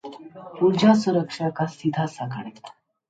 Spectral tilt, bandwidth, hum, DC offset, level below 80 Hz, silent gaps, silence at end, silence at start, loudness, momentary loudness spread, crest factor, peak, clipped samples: -6.5 dB/octave; 9 kHz; none; under 0.1%; -68 dBFS; none; 0.4 s; 0.05 s; -22 LUFS; 22 LU; 18 dB; -4 dBFS; under 0.1%